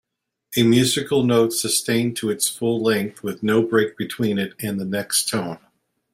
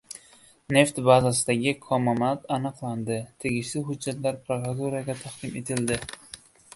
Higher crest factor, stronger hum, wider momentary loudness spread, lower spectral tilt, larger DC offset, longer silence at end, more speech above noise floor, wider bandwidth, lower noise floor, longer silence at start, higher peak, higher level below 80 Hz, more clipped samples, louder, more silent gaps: second, 18 dB vs 24 dB; neither; second, 9 LU vs 15 LU; about the same, -4 dB/octave vs -5 dB/octave; neither; first, 0.55 s vs 0.4 s; about the same, 32 dB vs 30 dB; first, 16 kHz vs 12 kHz; about the same, -53 dBFS vs -55 dBFS; first, 0.5 s vs 0.1 s; about the same, -4 dBFS vs -4 dBFS; about the same, -60 dBFS vs -56 dBFS; neither; first, -20 LUFS vs -26 LUFS; neither